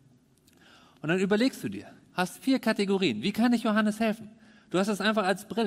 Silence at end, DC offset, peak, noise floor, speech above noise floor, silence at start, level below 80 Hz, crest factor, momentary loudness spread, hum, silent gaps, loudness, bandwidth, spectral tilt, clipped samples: 0 s; under 0.1%; -12 dBFS; -61 dBFS; 35 dB; 1.05 s; -68 dBFS; 16 dB; 12 LU; none; none; -28 LUFS; 16 kHz; -5.5 dB/octave; under 0.1%